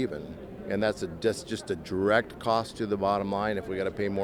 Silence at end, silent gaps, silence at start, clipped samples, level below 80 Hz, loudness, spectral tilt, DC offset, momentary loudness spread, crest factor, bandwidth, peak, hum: 0 s; none; 0 s; under 0.1%; -54 dBFS; -29 LUFS; -5.5 dB/octave; under 0.1%; 9 LU; 20 dB; 16.5 kHz; -10 dBFS; none